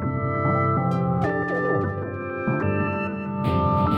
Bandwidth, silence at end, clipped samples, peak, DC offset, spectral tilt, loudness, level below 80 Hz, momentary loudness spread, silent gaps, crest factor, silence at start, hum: 6 kHz; 0 s; under 0.1%; -10 dBFS; under 0.1%; -9.5 dB/octave; -24 LUFS; -46 dBFS; 6 LU; none; 12 dB; 0 s; none